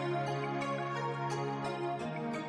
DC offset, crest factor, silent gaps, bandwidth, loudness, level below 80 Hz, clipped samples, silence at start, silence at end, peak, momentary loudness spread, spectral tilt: under 0.1%; 12 dB; none; 11 kHz; -36 LUFS; -74 dBFS; under 0.1%; 0 s; 0 s; -24 dBFS; 2 LU; -6.5 dB/octave